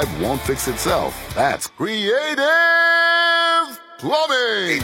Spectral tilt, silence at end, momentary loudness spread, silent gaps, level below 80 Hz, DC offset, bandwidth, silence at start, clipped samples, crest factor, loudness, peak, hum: -3 dB/octave; 0 s; 9 LU; none; -42 dBFS; under 0.1%; 16.5 kHz; 0 s; under 0.1%; 14 dB; -17 LUFS; -4 dBFS; none